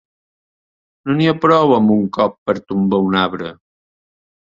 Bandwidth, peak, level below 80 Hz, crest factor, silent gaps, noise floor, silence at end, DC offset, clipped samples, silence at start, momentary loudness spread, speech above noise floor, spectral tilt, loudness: 7.4 kHz; -2 dBFS; -54 dBFS; 16 dB; 2.38-2.46 s; under -90 dBFS; 1.05 s; under 0.1%; under 0.1%; 1.05 s; 12 LU; over 75 dB; -8 dB/octave; -15 LUFS